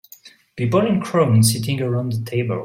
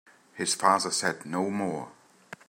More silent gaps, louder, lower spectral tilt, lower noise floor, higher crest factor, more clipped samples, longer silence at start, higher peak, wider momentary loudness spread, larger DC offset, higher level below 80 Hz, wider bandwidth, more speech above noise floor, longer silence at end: neither; first, -19 LUFS vs -27 LUFS; first, -6 dB/octave vs -3 dB/octave; about the same, -47 dBFS vs -50 dBFS; second, 14 dB vs 24 dB; neither; about the same, 0.25 s vs 0.35 s; about the same, -4 dBFS vs -6 dBFS; second, 8 LU vs 16 LU; neither; first, -56 dBFS vs -76 dBFS; about the same, 16.5 kHz vs 16 kHz; first, 29 dB vs 22 dB; second, 0 s vs 0.15 s